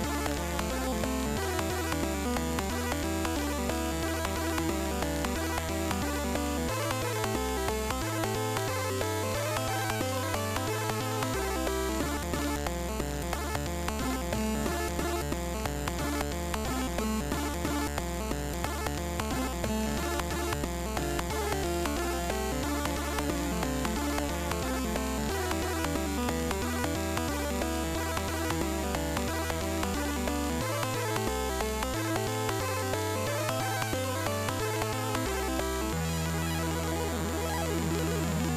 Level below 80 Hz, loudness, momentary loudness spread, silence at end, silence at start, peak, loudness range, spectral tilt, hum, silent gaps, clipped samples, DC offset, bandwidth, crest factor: -38 dBFS; -31 LUFS; 2 LU; 0 s; 0 s; -18 dBFS; 1 LU; -4.5 dB/octave; none; none; under 0.1%; under 0.1%; 19.5 kHz; 12 dB